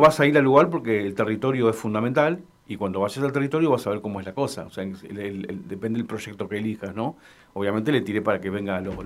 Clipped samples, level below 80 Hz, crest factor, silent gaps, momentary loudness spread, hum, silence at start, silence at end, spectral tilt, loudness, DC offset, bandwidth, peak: under 0.1%; -58 dBFS; 20 dB; none; 14 LU; none; 0 s; 0 s; -6.5 dB/octave; -24 LUFS; under 0.1%; 15.5 kHz; -4 dBFS